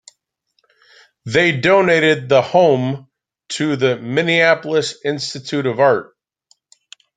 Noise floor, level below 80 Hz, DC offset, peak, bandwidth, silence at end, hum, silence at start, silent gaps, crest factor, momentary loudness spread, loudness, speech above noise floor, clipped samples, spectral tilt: -68 dBFS; -60 dBFS; under 0.1%; 0 dBFS; 9.4 kHz; 1.15 s; none; 1.25 s; none; 16 dB; 10 LU; -16 LUFS; 52 dB; under 0.1%; -5 dB/octave